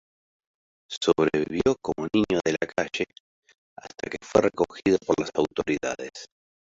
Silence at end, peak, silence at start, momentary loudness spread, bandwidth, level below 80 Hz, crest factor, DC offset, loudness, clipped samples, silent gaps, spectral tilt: 0.5 s; -6 dBFS; 0.9 s; 14 LU; 8 kHz; -56 dBFS; 22 dB; under 0.1%; -26 LUFS; under 0.1%; 0.97-1.01 s, 3.20-3.43 s, 3.58-3.76 s; -5 dB/octave